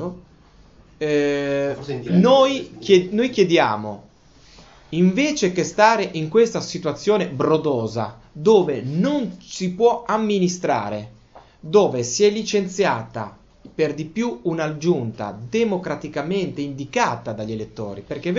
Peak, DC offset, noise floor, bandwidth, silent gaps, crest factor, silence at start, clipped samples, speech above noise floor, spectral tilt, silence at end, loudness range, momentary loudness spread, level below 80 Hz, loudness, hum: 0 dBFS; under 0.1%; -50 dBFS; 8 kHz; none; 20 dB; 0 s; under 0.1%; 30 dB; -5.5 dB/octave; 0 s; 5 LU; 13 LU; -54 dBFS; -20 LUFS; none